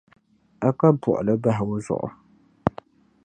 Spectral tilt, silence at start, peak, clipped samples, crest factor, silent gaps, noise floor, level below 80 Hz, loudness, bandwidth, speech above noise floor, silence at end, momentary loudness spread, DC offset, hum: -9 dB/octave; 0.6 s; 0 dBFS; under 0.1%; 24 dB; none; -46 dBFS; -54 dBFS; -23 LUFS; 9.8 kHz; 25 dB; 0.55 s; 10 LU; under 0.1%; none